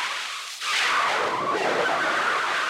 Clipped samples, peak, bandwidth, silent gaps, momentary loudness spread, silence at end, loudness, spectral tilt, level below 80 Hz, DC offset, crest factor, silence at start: under 0.1%; -12 dBFS; 16.5 kHz; none; 8 LU; 0 s; -23 LUFS; -1 dB/octave; -72 dBFS; under 0.1%; 12 dB; 0 s